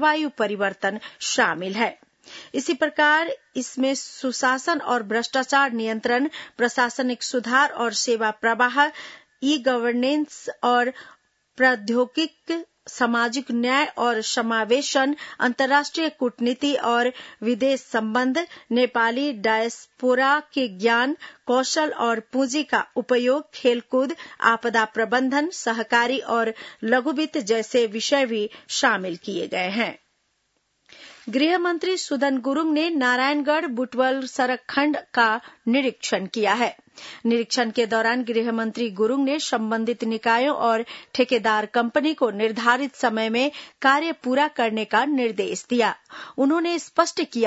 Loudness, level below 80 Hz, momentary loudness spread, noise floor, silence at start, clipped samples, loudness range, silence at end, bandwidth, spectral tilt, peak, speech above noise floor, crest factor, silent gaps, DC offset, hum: -22 LUFS; -76 dBFS; 7 LU; -71 dBFS; 0 s; under 0.1%; 2 LU; 0 s; 8 kHz; -3 dB/octave; -2 dBFS; 48 dB; 20 dB; none; under 0.1%; none